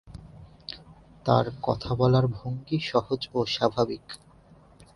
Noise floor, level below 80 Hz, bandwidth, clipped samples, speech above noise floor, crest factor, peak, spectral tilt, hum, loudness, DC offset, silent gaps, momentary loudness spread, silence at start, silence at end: -54 dBFS; -52 dBFS; 11.5 kHz; under 0.1%; 29 dB; 22 dB; -6 dBFS; -7 dB/octave; none; -26 LUFS; under 0.1%; none; 21 LU; 0.05 s; 0.1 s